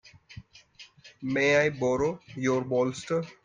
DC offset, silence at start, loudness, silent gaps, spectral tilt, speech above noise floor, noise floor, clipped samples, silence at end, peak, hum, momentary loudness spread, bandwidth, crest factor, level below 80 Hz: under 0.1%; 0.05 s; -27 LUFS; none; -5.5 dB/octave; 27 dB; -53 dBFS; under 0.1%; 0.1 s; -10 dBFS; none; 21 LU; 9.6 kHz; 18 dB; -62 dBFS